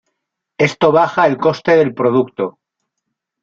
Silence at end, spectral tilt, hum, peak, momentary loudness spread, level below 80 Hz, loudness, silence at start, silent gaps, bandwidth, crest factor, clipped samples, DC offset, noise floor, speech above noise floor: 0.9 s; -6.5 dB/octave; none; -2 dBFS; 9 LU; -58 dBFS; -14 LUFS; 0.6 s; none; 7.4 kHz; 14 dB; under 0.1%; under 0.1%; -77 dBFS; 63 dB